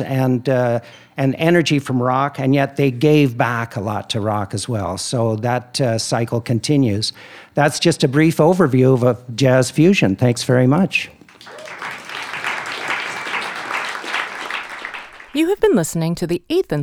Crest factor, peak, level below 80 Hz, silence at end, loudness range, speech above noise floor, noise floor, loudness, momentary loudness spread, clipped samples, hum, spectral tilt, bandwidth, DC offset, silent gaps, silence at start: 16 dB; -2 dBFS; -54 dBFS; 0 s; 8 LU; 21 dB; -38 dBFS; -18 LUFS; 12 LU; under 0.1%; none; -5.5 dB/octave; 16.5 kHz; under 0.1%; none; 0 s